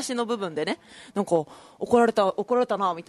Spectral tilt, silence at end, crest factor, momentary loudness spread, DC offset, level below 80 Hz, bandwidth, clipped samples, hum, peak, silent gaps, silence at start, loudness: -5 dB/octave; 0.05 s; 18 dB; 14 LU; under 0.1%; -64 dBFS; 12 kHz; under 0.1%; none; -6 dBFS; none; 0 s; -25 LUFS